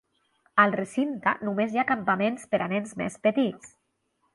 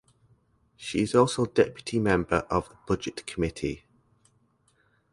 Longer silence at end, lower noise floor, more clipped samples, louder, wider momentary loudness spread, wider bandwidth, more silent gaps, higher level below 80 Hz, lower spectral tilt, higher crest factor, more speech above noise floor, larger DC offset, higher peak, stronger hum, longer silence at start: second, 0.65 s vs 1.35 s; first, -74 dBFS vs -67 dBFS; neither; about the same, -26 LUFS vs -27 LUFS; second, 7 LU vs 11 LU; about the same, 11.5 kHz vs 11.5 kHz; neither; second, -68 dBFS vs -48 dBFS; about the same, -6 dB/octave vs -5.5 dB/octave; about the same, 22 dB vs 22 dB; first, 48 dB vs 41 dB; neither; about the same, -6 dBFS vs -6 dBFS; neither; second, 0.55 s vs 0.8 s